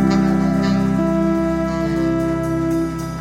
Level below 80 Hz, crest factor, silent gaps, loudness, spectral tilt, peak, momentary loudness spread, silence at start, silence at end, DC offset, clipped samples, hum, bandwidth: -34 dBFS; 12 dB; none; -18 LUFS; -7.5 dB/octave; -6 dBFS; 4 LU; 0 s; 0 s; under 0.1%; under 0.1%; none; 15 kHz